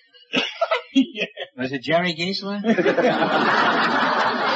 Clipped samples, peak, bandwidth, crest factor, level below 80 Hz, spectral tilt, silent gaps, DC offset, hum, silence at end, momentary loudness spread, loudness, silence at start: under 0.1%; -6 dBFS; 8 kHz; 14 dB; -68 dBFS; -5 dB/octave; none; under 0.1%; none; 0 s; 10 LU; -21 LUFS; 0.3 s